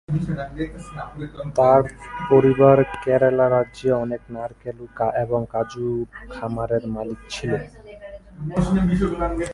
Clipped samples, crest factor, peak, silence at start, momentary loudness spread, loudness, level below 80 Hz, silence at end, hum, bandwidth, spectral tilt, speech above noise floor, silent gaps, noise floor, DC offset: under 0.1%; 20 dB; 0 dBFS; 0.1 s; 18 LU; -21 LUFS; -40 dBFS; 0 s; none; 11.5 kHz; -7.5 dB/octave; 19 dB; none; -40 dBFS; under 0.1%